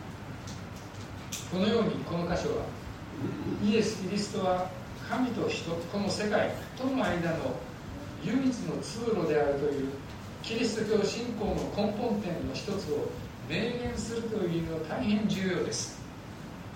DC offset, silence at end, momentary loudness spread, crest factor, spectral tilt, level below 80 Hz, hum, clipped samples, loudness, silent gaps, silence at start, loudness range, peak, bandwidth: under 0.1%; 0 s; 13 LU; 18 dB; -5.5 dB/octave; -52 dBFS; none; under 0.1%; -32 LUFS; none; 0 s; 2 LU; -14 dBFS; 16 kHz